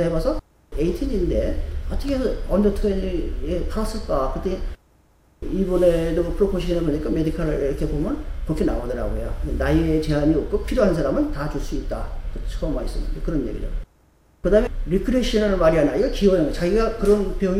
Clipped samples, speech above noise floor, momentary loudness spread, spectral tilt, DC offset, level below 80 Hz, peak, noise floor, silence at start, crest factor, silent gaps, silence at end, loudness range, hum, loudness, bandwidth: under 0.1%; 36 dB; 11 LU; -7 dB/octave; under 0.1%; -28 dBFS; -4 dBFS; -57 dBFS; 0 s; 16 dB; none; 0 s; 5 LU; none; -23 LUFS; 14.5 kHz